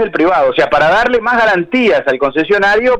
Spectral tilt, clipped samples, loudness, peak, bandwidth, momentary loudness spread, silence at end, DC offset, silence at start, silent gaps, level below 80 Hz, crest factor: -5.5 dB/octave; under 0.1%; -11 LUFS; -2 dBFS; 10 kHz; 3 LU; 0 s; under 0.1%; 0 s; none; -40 dBFS; 10 dB